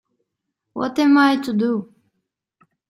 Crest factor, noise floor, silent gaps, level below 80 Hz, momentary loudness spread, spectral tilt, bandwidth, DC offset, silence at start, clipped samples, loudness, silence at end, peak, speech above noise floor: 18 dB; -79 dBFS; none; -66 dBFS; 13 LU; -5.5 dB/octave; 12.5 kHz; under 0.1%; 0.75 s; under 0.1%; -18 LUFS; 1.05 s; -4 dBFS; 62 dB